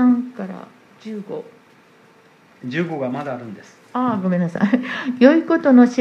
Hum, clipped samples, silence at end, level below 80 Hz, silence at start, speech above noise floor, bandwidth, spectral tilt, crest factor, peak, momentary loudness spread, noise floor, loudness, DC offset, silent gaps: none; under 0.1%; 0 s; -70 dBFS; 0 s; 33 dB; 6.8 kHz; -7.5 dB/octave; 20 dB; 0 dBFS; 21 LU; -51 dBFS; -18 LUFS; under 0.1%; none